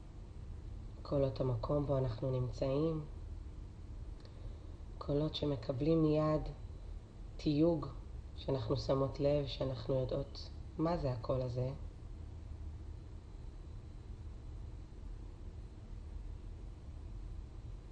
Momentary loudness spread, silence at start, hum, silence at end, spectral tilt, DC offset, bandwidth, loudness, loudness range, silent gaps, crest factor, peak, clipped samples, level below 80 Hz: 18 LU; 0 s; none; 0 s; -8.5 dB/octave; under 0.1%; 8.8 kHz; -37 LUFS; 15 LU; none; 18 dB; -22 dBFS; under 0.1%; -48 dBFS